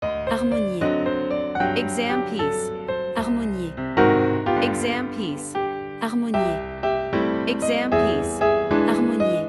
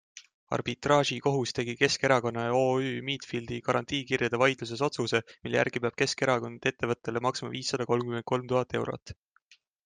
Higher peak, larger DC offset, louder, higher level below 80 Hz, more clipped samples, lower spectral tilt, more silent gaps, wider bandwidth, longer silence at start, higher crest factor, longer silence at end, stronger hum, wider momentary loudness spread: first, -2 dBFS vs -10 dBFS; neither; first, -23 LUFS vs -29 LUFS; first, -46 dBFS vs -64 dBFS; neither; about the same, -5.5 dB/octave vs -4.5 dB/octave; second, none vs 0.34-0.47 s, 9.02-9.06 s; first, 12 kHz vs 10 kHz; second, 0 s vs 0.15 s; about the same, 20 dB vs 20 dB; second, 0 s vs 0.7 s; neither; about the same, 8 LU vs 8 LU